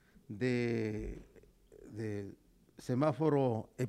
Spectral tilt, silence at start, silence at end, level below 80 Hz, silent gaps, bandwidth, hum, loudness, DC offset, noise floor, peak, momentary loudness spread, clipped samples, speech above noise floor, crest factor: -8 dB/octave; 0.3 s; 0 s; -58 dBFS; none; 13.5 kHz; none; -35 LUFS; under 0.1%; -61 dBFS; -18 dBFS; 19 LU; under 0.1%; 26 dB; 18 dB